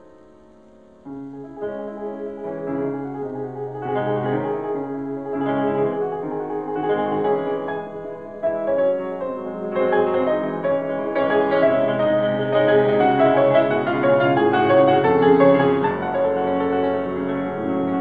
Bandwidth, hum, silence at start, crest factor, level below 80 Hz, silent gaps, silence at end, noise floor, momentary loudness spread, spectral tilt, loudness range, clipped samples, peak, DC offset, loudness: 4.9 kHz; none; 1.05 s; 18 dB; -60 dBFS; none; 0 s; -49 dBFS; 14 LU; -9 dB/octave; 10 LU; under 0.1%; -2 dBFS; 0.3%; -20 LUFS